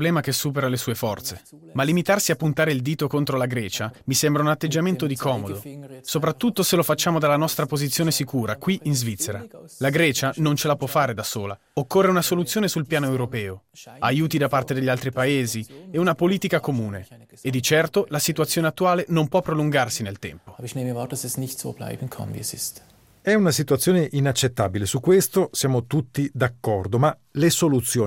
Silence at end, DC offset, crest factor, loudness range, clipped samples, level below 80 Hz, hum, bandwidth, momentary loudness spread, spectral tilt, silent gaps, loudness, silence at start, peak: 0 s; under 0.1%; 16 dB; 3 LU; under 0.1%; -60 dBFS; none; 17 kHz; 11 LU; -4.5 dB/octave; none; -22 LUFS; 0 s; -6 dBFS